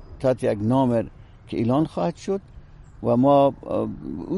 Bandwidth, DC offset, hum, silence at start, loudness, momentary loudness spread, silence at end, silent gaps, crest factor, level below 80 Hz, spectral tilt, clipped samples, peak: 11.5 kHz; under 0.1%; none; 0 s; -23 LUFS; 13 LU; 0 s; none; 16 dB; -48 dBFS; -8.5 dB/octave; under 0.1%; -6 dBFS